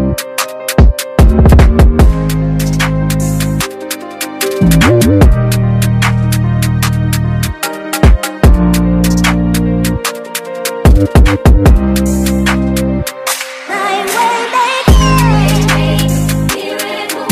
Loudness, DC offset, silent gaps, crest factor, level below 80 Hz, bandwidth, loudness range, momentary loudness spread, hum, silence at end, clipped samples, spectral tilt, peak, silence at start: -11 LUFS; under 0.1%; none; 10 dB; -14 dBFS; 16 kHz; 2 LU; 9 LU; none; 0 s; under 0.1%; -5.5 dB/octave; 0 dBFS; 0 s